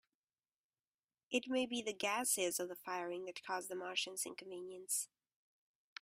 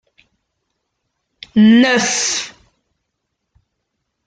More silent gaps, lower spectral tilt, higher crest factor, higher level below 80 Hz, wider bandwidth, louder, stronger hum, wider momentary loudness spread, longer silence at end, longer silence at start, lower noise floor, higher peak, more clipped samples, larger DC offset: neither; second, -1 dB/octave vs -3.5 dB/octave; about the same, 20 dB vs 16 dB; second, -86 dBFS vs -58 dBFS; first, 16 kHz vs 9.4 kHz; second, -40 LUFS vs -13 LUFS; neither; about the same, 13 LU vs 12 LU; second, 0.95 s vs 1.75 s; second, 1.3 s vs 1.55 s; first, under -90 dBFS vs -74 dBFS; second, -22 dBFS vs -2 dBFS; neither; neither